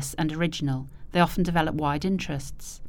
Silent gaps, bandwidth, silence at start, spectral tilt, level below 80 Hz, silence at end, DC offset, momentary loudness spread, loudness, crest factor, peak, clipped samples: none; 19 kHz; 0 s; -5.5 dB/octave; -42 dBFS; 0 s; under 0.1%; 10 LU; -27 LUFS; 20 dB; -6 dBFS; under 0.1%